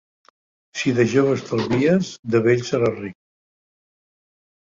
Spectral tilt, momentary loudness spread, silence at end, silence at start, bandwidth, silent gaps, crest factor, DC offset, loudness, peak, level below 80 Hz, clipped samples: -6.5 dB/octave; 10 LU; 1.55 s; 0.75 s; 7.6 kHz; 2.19-2.23 s; 18 dB; under 0.1%; -20 LUFS; -4 dBFS; -56 dBFS; under 0.1%